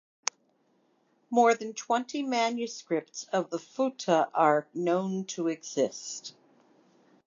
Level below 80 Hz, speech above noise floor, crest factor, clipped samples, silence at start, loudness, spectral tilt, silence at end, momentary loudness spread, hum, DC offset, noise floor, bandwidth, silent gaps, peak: -88 dBFS; 41 dB; 26 dB; under 0.1%; 1.3 s; -29 LUFS; -4 dB/octave; 0.95 s; 11 LU; none; under 0.1%; -70 dBFS; 7.6 kHz; none; -4 dBFS